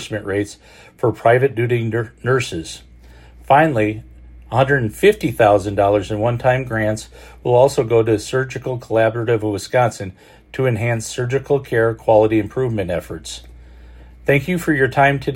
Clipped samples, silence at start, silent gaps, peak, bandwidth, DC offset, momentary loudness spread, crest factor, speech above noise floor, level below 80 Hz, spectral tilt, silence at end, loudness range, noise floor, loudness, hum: under 0.1%; 0 s; none; 0 dBFS; 16.5 kHz; under 0.1%; 13 LU; 18 dB; 25 dB; -44 dBFS; -6 dB/octave; 0 s; 3 LU; -43 dBFS; -17 LUFS; none